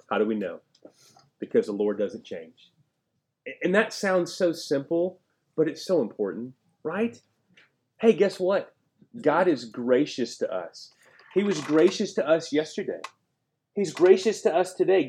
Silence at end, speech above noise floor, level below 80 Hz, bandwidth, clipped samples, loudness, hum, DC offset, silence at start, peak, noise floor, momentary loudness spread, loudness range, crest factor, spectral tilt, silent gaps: 0 s; 53 dB; -82 dBFS; 13 kHz; under 0.1%; -25 LUFS; none; under 0.1%; 0.1 s; -6 dBFS; -78 dBFS; 17 LU; 5 LU; 20 dB; -5 dB/octave; none